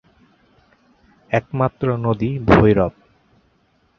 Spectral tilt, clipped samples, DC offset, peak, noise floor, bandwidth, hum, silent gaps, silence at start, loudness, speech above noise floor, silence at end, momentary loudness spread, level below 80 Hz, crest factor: -9 dB/octave; under 0.1%; under 0.1%; -2 dBFS; -61 dBFS; 6.8 kHz; none; none; 1.3 s; -18 LUFS; 44 dB; 1.1 s; 10 LU; -38 dBFS; 20 dB